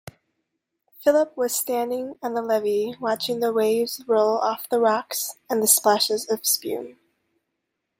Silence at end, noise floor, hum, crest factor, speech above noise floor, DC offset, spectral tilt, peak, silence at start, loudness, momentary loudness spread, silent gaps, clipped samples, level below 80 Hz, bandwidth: 1.1 s; -79 dBFS; none; 22 dB; 57 dB; under 0.1%; -2 dB/octave; -2 dBFS; 1 s; -22 LUFS; 10 LU; none; under 0.1%; -72 dBFS; 16.5 kHz